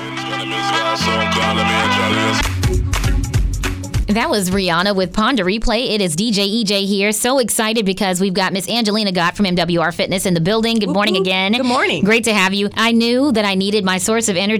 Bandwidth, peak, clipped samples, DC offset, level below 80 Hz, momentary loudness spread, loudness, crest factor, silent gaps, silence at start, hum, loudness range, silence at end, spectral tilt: over 20 kHz; -6 dBFS; under 0.1%; under 0.1%; -28 dBFS; 4 LU; -16 LUFS; 10 dB; none; 0 s; none; 2 LU; 0 s; -4 dB/octave